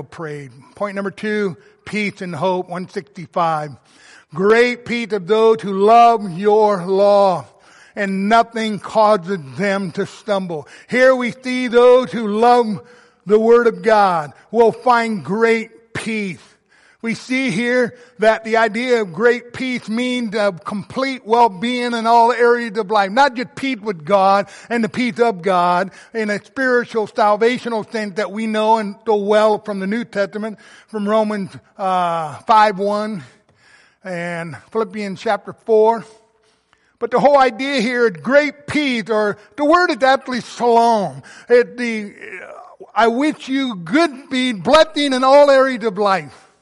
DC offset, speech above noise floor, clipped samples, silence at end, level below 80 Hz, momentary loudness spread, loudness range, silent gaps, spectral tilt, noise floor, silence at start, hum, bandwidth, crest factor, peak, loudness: under 0.1%; 43 dB; under 0.1%; 0.3 s; -58 dBFS; 13 LU; 5 LU; none; -5 dB/octave; -59 dBFS; 0 s; none; 11.5 kHz; 16 dB; -2 dBFS; -17 LUFS